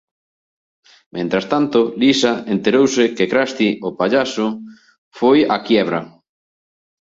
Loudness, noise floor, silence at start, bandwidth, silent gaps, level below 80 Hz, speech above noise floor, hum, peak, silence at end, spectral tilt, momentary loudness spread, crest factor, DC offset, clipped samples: -17 LUFS; under -90 dBFS; 1.15 s; 8 kHz; 4.98-5.11 s; -60 dBFS; over 74 dB; none; -2 dBFS; 0.9 s; -4.5 dB/octave; 8 LU; 16 dB; under 0.1%; under 0.1%